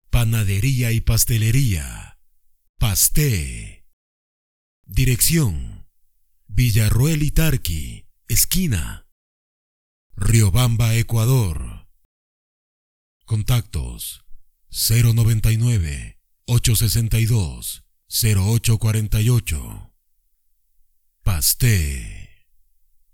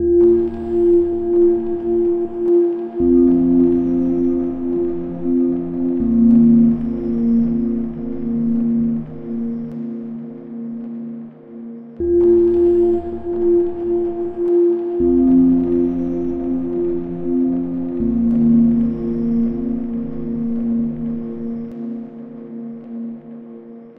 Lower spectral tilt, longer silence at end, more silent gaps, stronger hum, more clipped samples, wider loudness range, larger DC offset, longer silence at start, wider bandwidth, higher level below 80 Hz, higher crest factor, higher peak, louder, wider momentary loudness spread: second, -4.5 dB/octave vs -12 dB/octave; first, 0.85 s vs 0.05 s; first, 2.69-2.74 s, 3.93-4.84 s, 9.12-10.10 s, 12.05-13.20 s vs none; neither; neither; second, 4 LU vs 8 LU; neither; about the same, 0.1 s vs 0 s; first, 19.5 kHz vs 2.7 kHz; first, -28 dBFS vs -40 dBFS; first, 20 dB vs 14 dB; first, 0 dBFS vs -4 dBFS; about the same, -19 LUFS vs -17 LUFS; about the same, 16 LU vs 17 LU